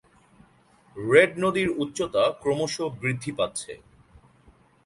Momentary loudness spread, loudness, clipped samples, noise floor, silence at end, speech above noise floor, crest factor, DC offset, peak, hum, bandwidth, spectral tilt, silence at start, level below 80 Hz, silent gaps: 16 LU; -24 LUFS; under 0.1%; -59 dBFS; 1.1 s; 34 dB; 24 dB; under 0.1%; -2 dBFS; none; 11.5 kHz; -4.5 dB/octave; 0.95 s; -60 dBFS; none